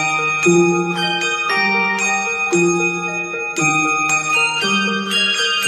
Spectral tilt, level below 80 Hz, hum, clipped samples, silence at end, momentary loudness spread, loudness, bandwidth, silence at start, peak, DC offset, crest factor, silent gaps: -3 dB/octave; -64 dBFS; none; under 0.1%; 0 s; 4 LU; -16 LUFS; 13.5 kHz; 0 s; -2 dBFS; under 0.1%; 14 dB; none